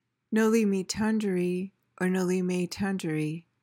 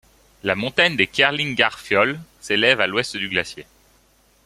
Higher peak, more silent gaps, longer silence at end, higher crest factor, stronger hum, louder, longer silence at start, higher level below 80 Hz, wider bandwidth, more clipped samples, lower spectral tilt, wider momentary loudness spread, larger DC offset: second, -14 dBFS vs 0 dBFS; neither; second, 0.25 s vs 0.85 s; second, 14 dB vs 22 dB; neither; second, -28 LUFS vs -19 LUFS; second, 0.3 s vs 0.45 s; second, -64 dBFS vs -56 dBFS; about the same, 17 kHz vs 15.5 kHz; neither; first, -6 dB/octave vs -3.5 dB/octave; about the same, 8 LU vs 10 LU; neither